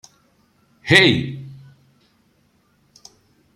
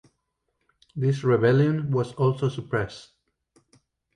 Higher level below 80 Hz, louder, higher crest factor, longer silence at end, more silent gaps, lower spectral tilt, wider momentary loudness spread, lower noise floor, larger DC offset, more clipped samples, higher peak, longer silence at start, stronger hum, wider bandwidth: about the same, -56 dBFS vs -58 dBFS; first, -15 LUFS vs -24 LUFS; about the same, 22 dB vs 18 dB; first, 2.05 s vs 1.15 s; neither; second, -4.5 dB/octave vs -8 dB/octave; first, 24 LU vs 13 LU; second, -61 dBFS vs -77 dBFS; neither; neither; first, 0 dBFS vs -8 dBFS; about the same, 0.85 s vs 0.95 s; neither; first, 15 kHz vs 9.6 kHz